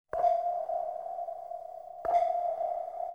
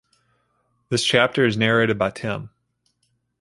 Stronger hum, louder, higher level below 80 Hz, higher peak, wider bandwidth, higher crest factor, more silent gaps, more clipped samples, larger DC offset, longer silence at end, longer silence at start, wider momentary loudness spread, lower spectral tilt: second, none vs 60 Hz at -50 dBFS; second, -32 LUFS vs -20 LUFS; second, -68 dBFS vs -56 dBFS; second, -16 dBFS vs -2 dBFS; second, 6.6 kHz vs 11.5 kHz; second, 16 dB vs 22 dB; neither; neither; neither; second, 0 s vs 0.95 s; second, 0.15 s vs 0.9 s; about the same, 13 LU vs 11 LU; about the same, -5 dB/octave vs -4.5 dB/octave